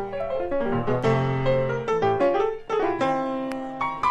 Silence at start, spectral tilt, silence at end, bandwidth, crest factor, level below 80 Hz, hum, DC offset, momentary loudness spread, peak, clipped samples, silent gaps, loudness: 0 s; -7.5 dB/octave; 0 s; 11 kHz; 14 dB; -48 dBFS; none; under 0.1%; 7 LU; -10 dBFS; under 0.1%; none; -25 LUFS